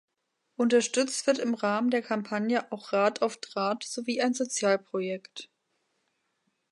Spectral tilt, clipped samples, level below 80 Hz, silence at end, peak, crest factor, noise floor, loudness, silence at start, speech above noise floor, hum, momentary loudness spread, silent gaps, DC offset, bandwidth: -3.5 dB/octave; under 0.1%; -84 dBFS; 1.25 s; -12 dBFS; 18 dB; -79 dBFS; -28 LUFS; 0.6 s; 51 dB; none; 8 LU; none; under 0.1%; 11.5 kHz